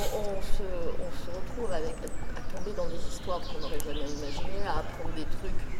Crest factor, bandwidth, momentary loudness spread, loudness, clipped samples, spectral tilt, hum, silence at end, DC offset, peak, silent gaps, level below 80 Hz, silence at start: 16 dB; 13.5 kHz; 5 LU; -36 LUFS; under 0.1%; -5 dB/octave; none; 0 s; under 0.1%; -10 dBFS; none; -34 dBFS; 0 s